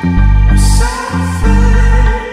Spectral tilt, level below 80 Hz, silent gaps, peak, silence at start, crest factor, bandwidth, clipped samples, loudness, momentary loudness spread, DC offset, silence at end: -6 dB/octave; -10 dBFS; none; 0 dBFS; 0 s; 8 dB; 12.5 kHz; under 0.1%; -11 LUFS; 5 LU; under 0.1%; 0 s